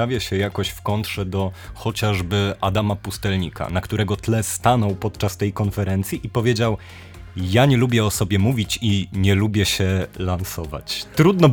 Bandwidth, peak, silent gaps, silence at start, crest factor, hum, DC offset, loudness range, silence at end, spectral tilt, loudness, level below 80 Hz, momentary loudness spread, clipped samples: 19.5 kHz; -2 dBFS; none; 0 s; 18 dB; none; under 0.1%; 4 LU; 0 s; -5.5 dB/octave; -21 LUFS; -42 dBFS; 9 LU; under 0.1%